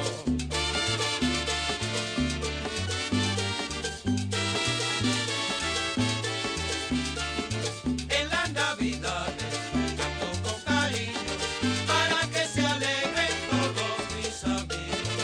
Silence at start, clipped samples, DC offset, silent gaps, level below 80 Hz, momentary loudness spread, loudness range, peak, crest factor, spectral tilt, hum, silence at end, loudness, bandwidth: 0 s; under 0.1%; under 0.1%; none; -46 dBFS; 5 LU; 2 LU; -14 dBFS; 16 dB; -3.5 dB/octave; none; 0 s; -28 LUFS; 14 kHz